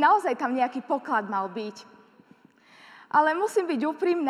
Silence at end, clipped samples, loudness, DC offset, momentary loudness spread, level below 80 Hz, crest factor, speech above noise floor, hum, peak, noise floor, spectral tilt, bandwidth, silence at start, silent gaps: 0 s; under 0.1%; -26 LUFS; under 0.1%; 11 LU; -88 dBFS; 18 dB; 32 dB; none; -8 dBFS; -57 dBFS; -4.5 dB/octave; 13.5 kHz; 0 s; none